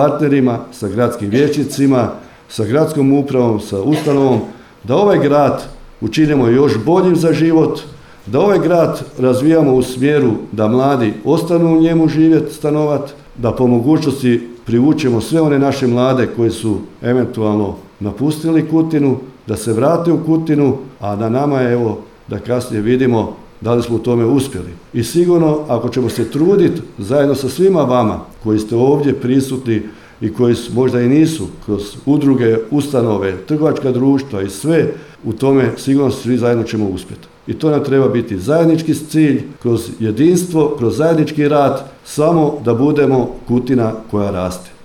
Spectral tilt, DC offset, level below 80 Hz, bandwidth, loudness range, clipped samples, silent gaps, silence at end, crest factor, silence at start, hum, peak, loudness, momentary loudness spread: -7 dB/octave; under 0.1%; -44 dBFS; 16.5 kHz; 3 LU; under 0.1%; none; 0 s; 12 dB; 0 s; none; -2 dBFS; -14 LUFS; 10 LU